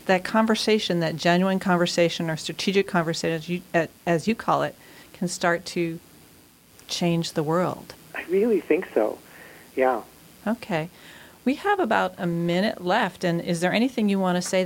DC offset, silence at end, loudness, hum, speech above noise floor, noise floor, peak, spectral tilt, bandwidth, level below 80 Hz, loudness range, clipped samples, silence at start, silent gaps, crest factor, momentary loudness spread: under 0.1%; 0 s; -24 LUFS; none; 30 dB; -53 dBFS; -8 dBFS; -5 dB/octave; 17 kHz; -62 dBFS; 4 LU; under 0.1%; 0.05 s; none; 18 dB; 9 LU